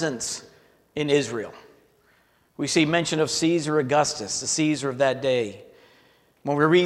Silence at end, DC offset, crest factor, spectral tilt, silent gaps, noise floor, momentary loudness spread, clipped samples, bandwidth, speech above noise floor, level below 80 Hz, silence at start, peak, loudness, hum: 0 s; under 0.1%; 18 dB; -4 dB/octave; none; -62 dBFS; 12 LU; under 0.1%; 13.5 kHz; 39 dB; -64 dBFS; 0 s; -6 dBFS; -24 LUFS; none